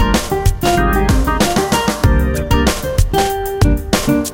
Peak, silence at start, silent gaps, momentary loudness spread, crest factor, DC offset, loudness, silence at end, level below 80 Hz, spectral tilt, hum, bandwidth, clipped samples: 0 dBFS; 0 s; none; 2 LU; 14 dB; under 0.1%; -15 LUFS; 0 s; -18 dBFS; -5 dB/octave; none; 17.5 kHz; under 0.1%